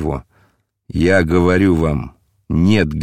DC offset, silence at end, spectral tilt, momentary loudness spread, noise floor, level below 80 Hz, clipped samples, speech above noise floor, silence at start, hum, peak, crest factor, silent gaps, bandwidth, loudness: under 0.1%; 0 s; -7.5 dB/octave; 13 LU; -59 dBFS; -34 dBFS; under 0.1%; 45 dB; 0 s; none; -2 dBFS; 16 dB; none; 12.5 kHz; -16 LUFS